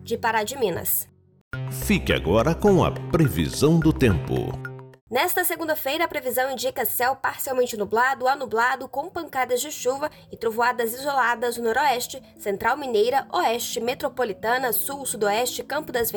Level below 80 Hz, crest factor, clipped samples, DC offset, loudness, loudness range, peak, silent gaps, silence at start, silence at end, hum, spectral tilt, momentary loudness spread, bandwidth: -42 dBFS; 16 dB; under 0.1%; under 0.1%; -23 LUFS; 3 LU; -8 dBFS; 1.41-1.51 s, 5.01-5.07 s; 0 s; 0 s; none; -4.5 dB/octave; 10 LU; over 20 kHz